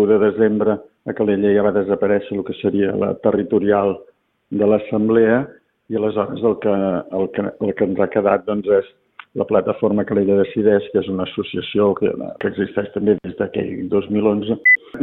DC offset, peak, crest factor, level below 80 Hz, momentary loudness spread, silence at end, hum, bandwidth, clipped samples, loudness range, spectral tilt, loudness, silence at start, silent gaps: under 0.1%; -2 dBFS; 16 dB; -54 dBFS; 9 LU; 0 s; none; 4 kHz; under 0.1%; 2 LU; -10.5 dB/octave; -18 LUFS; 0 s; none